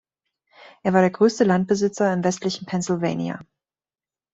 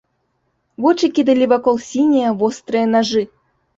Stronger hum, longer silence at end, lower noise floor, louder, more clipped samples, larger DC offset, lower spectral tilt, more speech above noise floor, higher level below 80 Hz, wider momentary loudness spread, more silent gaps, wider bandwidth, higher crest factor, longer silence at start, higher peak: neither; first, 0.9 s vs 0.5 s; first, under -90 dBFS vs -67 dBFS; second, -21 LUFS vs -16 LUFS; neither; neither; about the same, -6 dB/octave vs -5 dB/octave; first, over 69 dB vs 52 dB; about the same, -62 dBFS vs -60 dBFS; first, 10 LU vs 5 LU; neither; about the same, 8 kHz vs 8 kHz; about the same, 18 dB vs 14 dB; about the same, 0.85 s vs 0.8 s; about the same, -4 dBFS vs -2 dBFS